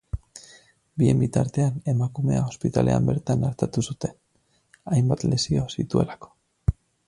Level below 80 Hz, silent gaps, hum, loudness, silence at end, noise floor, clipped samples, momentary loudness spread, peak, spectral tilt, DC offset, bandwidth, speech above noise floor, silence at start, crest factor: -42 dBFS; none; none; -24 LUFS; 0.35 s; -67 dBFS; under 0.1%; 15 LU; -6 dBFS; -7 dB/octave; under 0.1%; 11.5 kHz; 44 dB; 0.15 s; 18 dB